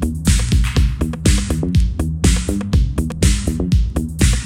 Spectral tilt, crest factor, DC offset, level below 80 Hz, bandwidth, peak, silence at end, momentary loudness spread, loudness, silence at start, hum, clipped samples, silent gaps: -5 dB/octave; 16 dB; 0.1%; -18 dBFS; 15.5 kHz; 0 dBFS; 0 s; 3 LU; -18 LUFS; 0 s; none; under 0.1%; none